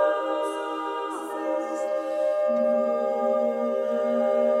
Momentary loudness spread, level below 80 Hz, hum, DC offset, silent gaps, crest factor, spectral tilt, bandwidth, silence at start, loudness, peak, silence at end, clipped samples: 7 LU; -80 dBFS; none; under 0.1%; none; 14 dB; -4.5 dB/octave; 13 kHz; 0 s; -26 LUFS; -12 dBFS; 0 s; under 0.1%